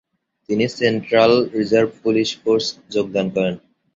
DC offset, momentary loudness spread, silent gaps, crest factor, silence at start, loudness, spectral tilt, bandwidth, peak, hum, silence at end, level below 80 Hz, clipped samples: under 0.1%; 9 LU; none; 18 dB; 0.5 s; -19 LUFS; -5.5 dB/octave; 7.8 kHz; -2 dBFS; none; 0.35 s; -58 dBFS; under 0.1%